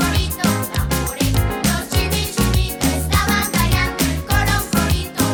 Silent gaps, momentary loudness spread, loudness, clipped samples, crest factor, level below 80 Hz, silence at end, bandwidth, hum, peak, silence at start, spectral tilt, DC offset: none; 3 LU; -18 LUFS; under 0.1%; 14 dB; -24 dBFS; 0 s; over 20 kHz; none; -4 dBFS; 0 s; -4 dB/octave; under 0.1%